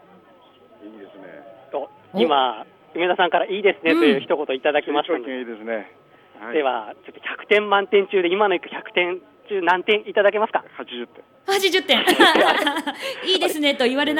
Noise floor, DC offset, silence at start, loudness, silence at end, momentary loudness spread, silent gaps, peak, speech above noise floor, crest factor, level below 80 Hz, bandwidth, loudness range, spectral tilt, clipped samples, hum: -51 dBFS; under 0.1%; 0.8 s; -20 LUFS; 0 s; 16 LU; none; 0 dBFS; 31 dB; 20 dB; -70 dBFS; 17 kHz; 5 LU; -3 dB/octave; under 0.1%; none